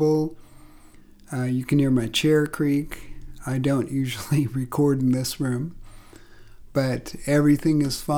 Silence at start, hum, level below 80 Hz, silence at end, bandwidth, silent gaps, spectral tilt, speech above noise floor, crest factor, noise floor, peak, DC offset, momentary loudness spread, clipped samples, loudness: 0 s; none; -46 dBFS; 0 s; 19 kHz; none; -6 dB/octave; 26 dB; 14 dB; -48 dBFS; -10 dBFS; under 0.1%; 10 LU; under 0.1%; -23 LUFS